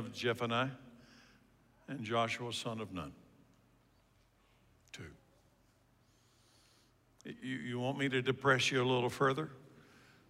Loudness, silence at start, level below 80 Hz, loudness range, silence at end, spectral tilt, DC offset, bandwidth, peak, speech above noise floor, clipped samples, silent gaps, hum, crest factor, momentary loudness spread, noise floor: -35 LUFS; 0 s; -74 dBFS; 25 LU; 0.5 s; -4.5 dB/octave; under 0.1%; 16 kHz; -16 dBFS; 35 dB; under 0.1%; none; none; 22 dB; 21 LU; -70 dBFS